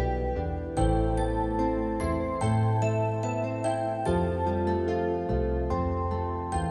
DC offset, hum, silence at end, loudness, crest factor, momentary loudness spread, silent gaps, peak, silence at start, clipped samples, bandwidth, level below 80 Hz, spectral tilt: under 0.1%; none; 0 s; -28 LUFS; 16 dB; 4 LU; none; -12 dBFS; 0 s; under 0.1%; 11.5 kHz; -36 dBFS; -7.5 dB/octave